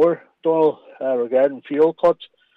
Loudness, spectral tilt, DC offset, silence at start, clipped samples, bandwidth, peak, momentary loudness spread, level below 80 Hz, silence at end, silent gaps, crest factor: -20 LUFS; -8 dB/octave; under 0.1%; 0 s; under 0.1%; 4.7 kHz; -6 dBFS; 7 LU; -64 dBFS; 0.3 s; none; 12 dB